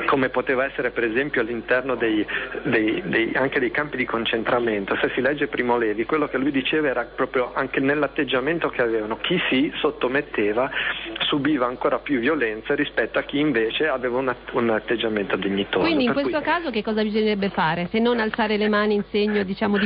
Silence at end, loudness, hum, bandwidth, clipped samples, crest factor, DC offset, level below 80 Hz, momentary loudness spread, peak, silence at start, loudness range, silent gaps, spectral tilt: 0 s; -22 LUFS; none; 5.2 kHz; under 0.1%; 12 dB; under 0.1%; -50 dBFS; 3 LU; -10 dBFS; 0 s; 1 LU; none; -10 dB/octave